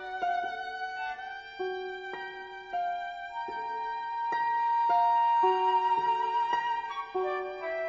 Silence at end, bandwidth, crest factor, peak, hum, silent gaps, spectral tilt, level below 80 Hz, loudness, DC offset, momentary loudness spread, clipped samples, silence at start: 0 s; 7.4 kHz; 16 dB; -16 dBFS; none; none; 0 dB/octave; -70 dBFS; -30 LUFS; under 0.1%; 13 LU; under 0.1%; 0 s